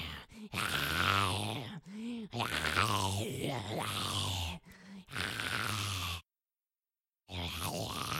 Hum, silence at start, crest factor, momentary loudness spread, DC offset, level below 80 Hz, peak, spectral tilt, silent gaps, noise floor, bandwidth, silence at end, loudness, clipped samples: none; 0 s; 26 dB; 14 LU; under 0.1%; -60 dBFS; -12 dBFS; -3.5 dB/octave; none; under -90 dBFS; 16.5 kHz; 0 s; -35 LUFS; under 0.1%